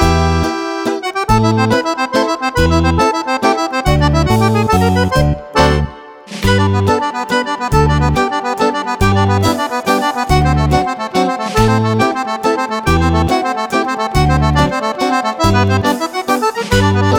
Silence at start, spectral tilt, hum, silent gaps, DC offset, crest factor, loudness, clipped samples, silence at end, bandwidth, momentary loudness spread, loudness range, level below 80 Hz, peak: 0 s; -6 dB/octave; none; none; under 0.1%; 12 dB; -14 LUFS; under 0.1%; 0 s; 20 kHz; 4 LU; 1 LU; -24 dBFS; 0 dBFS